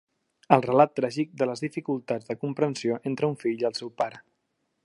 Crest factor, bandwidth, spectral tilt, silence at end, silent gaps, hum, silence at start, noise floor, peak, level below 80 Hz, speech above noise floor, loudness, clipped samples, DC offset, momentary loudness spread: 26 dB; 11.5 kHz; -6.5 dB/octave; 0.65 s; none; none; 0.5 s; -76 dBFS; -2 dBFS; -74 dBFS; 51 dB; -27 LUFS; under 0.1%; under 0.1%; 10 LU